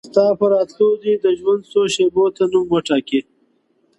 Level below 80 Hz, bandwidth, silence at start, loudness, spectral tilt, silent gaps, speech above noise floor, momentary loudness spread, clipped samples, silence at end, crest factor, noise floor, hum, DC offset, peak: -60 dBFS; 11 kHz; 0.05 s; -17 LUFS; -5 dB/octave; none; 45 dB; 3 LU; under 0.1%; 0.8 s; 16 dB; -61 dBFS; none; under 0.1%; -2 dBFS